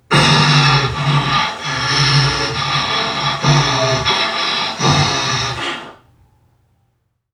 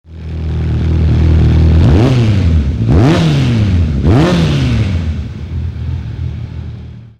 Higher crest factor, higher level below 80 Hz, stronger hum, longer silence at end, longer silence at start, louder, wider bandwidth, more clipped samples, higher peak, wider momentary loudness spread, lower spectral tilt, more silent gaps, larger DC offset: first, 16 dB vs 10 dB; second, -40 dBFS vs -18 dBFS; neither; first, 1.4 s vs 0.1 s; about the same, 0.1 s vs 0.1 s; about the same, -14 LUFS vs -12 LUFS; first, 11 kHz vs 8.8 kHz; neither; about the same, 0 dBFS vs -2 dBFS; second, 8 LU vs 13 LU; second, -4 dB/octave vs -8 dB/octave; neither; neither